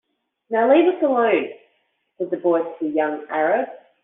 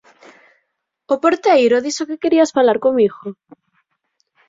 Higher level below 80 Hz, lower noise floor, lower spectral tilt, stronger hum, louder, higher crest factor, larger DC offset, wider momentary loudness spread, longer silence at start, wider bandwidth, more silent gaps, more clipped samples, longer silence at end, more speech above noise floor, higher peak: second, -74 dBFS vs -62 dBFS; second, -68 dBFS vs -72 dBFS; about the same, -3.5 dB/octave vs -4 dB/octave; neither; second, -20 LUFS vs -15 LUFS; about the same, 16 dB vs 16 dB; neither; first, 12 LU vs 9 LU; second, 0.5 s vs 1.1 s; second, 3.9 kHz vs 7.8 kHz; neither; neither; second, 0.25 s vs 1.15 s; second, 49 dB vs 56 dB; about the same, -4 dBFS vs -2 dBFS